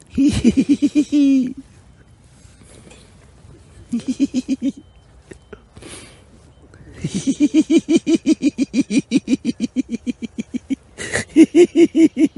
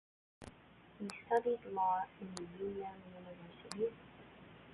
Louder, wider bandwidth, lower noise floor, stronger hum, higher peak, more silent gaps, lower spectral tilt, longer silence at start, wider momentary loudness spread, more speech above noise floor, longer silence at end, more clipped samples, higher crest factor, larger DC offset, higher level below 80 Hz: first, -17 LUFS vs -40 LUFS; first, 11.5 kHz vs 4.2 kHz; second, -48 dBFS vs -62 dBFS; neither; first, 0 dBFS vs -22 dBFS; neither; first, -5.5 dB/octave vs -4 dB/octave; second, 0.15 s vs 0.4 s; second, 15 LU vs 22 LU; first, 32 dB vs 22 dB; about the same, 0.1 s vs 0 s; neither; about the same, 18 dB vs 20 dB; neither; first, -46 dBFS vs -72 dBFS